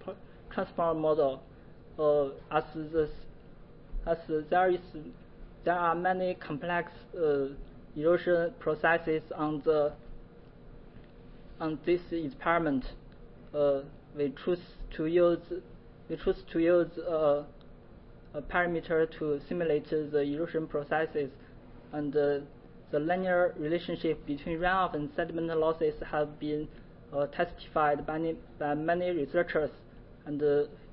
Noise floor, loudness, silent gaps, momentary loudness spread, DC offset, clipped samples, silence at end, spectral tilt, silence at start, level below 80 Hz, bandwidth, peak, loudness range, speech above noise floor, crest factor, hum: -52 dBFS; -31 LUFS; none; 12 LU; under 0.1%; under 0.1%; 0 s; -10 dB/octave; 0 s; -52 dBFS; 5.6 kHz; -12 dBFS; 3 LU; 21 dB; 18 dB; none